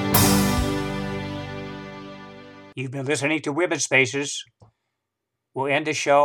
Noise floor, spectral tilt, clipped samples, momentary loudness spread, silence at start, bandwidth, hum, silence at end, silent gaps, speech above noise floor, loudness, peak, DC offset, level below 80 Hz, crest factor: -82 dBFS; -4 dB/octave; under 0.1%; 20 LU; 0 s; 19 kHz; none; 0 s; none; 59 dB; -23 LUFS; -2 dBFS; under 0.1%; -42 dBFS; 22 dB